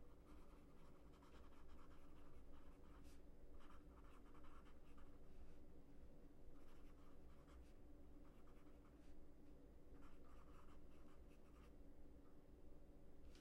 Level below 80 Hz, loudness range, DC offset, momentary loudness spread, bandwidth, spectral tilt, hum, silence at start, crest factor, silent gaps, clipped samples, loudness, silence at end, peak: -64 dBFS; 1 LU; under 0.1%; 2 LU; 11 kHz; -6.5 dB/octave; none; 0 s; 12 dB; none; under 0.1%; -68 LUFS; 0 s; -48 dBFS